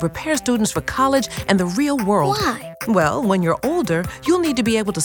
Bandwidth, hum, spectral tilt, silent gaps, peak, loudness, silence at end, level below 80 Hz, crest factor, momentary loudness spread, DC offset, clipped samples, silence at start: over 20 kHz; none; -5 dB/octave; none; -2 dBFS; -19 LUFS; 0 s; -44 dBFS; 16 dB; 4 LU; under 0.1%; under 0.1%; 0 s